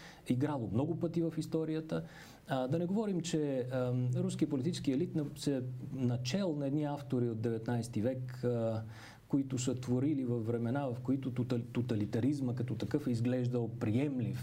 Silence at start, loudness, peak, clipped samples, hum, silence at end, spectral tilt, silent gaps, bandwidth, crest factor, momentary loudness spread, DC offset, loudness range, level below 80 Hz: 0 s; -35 LUFS; -18 dBFS; under 0.1%; none; 0 s; -7 dB/octave; none; 15.5 kHz; 16 dB; 4 LU; under 0.1%; 1 LU; -66 dBFS